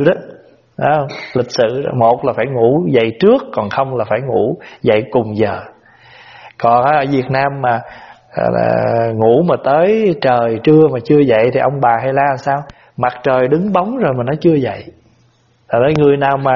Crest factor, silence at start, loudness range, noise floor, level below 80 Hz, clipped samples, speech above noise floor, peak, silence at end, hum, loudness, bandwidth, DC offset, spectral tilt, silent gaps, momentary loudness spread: 14 dB; 0 s; 4 LU; -53 dBFS; -50 dBFS; under 0.1%; 40 dB; 0 dBFS; 0 s; none; -14 LUFS; 6.8 kHz; under 0.1%; -6 dB/octave; none; 8 LU